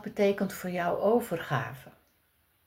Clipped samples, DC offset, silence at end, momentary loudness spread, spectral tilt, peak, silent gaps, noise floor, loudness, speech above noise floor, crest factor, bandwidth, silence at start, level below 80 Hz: under 0.1%; under 0.1%; 0.75 s; 9 LU; -6 dB/octave; -14 dBFS; none; -70 dBFS; -30 LUFS; 41 dB; 18 dB; 16 kHz; 0 s; -68 dBFS